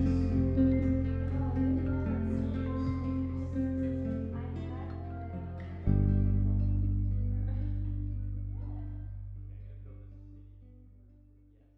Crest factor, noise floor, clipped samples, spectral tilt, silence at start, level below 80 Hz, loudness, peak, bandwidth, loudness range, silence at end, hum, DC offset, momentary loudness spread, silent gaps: 16 dB; -60 dBFS; under 0.1%; -11 dB/octave; 0 s; -38 dBFS; -33 LUFS; -16 dBFS; 5.2 kHz; 10 LU; 0.9 s; none; under 0.1%; 17 LU; none